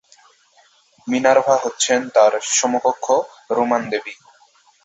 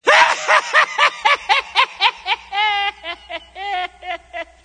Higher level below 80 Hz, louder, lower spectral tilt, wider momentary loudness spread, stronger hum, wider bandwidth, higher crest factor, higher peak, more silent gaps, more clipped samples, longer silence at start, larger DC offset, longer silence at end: second, -66 dBFS vs -56 dBFS; about the same, -18 LUFS vs -16 LUFS; first, -2 dB/octave vs 0.5 dB/octave; second, 10 LU vs 16 LU; neither; second, 8.4 kHz vs 9.6 kHz; about the same, 18 dB vs 18 dB; about the same, -2 dBFS vs 0 dBFS; neither; neither; first, 1.05 s vs 0.05 s; neither; first, 0.7 s vs 0.2 s